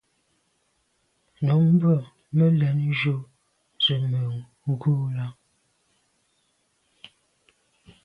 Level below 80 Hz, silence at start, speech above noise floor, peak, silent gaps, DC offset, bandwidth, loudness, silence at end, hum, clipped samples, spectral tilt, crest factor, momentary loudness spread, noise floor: -66 dBFS; 1.4 s; 48 dB; -10 dBFS; none; under 0.1%; 5.2 kHz; -24 LUFS; 2.7 s; none; under 0.1%; -8.5 dB/octave; 16 dB; 13 LU; -70 dBFS